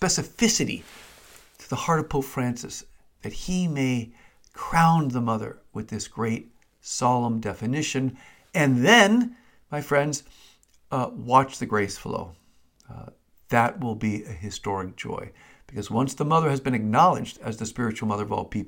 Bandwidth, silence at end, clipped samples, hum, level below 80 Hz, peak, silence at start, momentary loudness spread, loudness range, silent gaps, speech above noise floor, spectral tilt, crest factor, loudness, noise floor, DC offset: 17 kHz; 0 s; under 0.1%; none; -50 dBFS; -2 dBFS; 0 s; 16 LU; 7 LU; none; 34 dB; -4.5 dB/octave; 22 dB; -24 LUFS; -59 dBFS; under 0.1%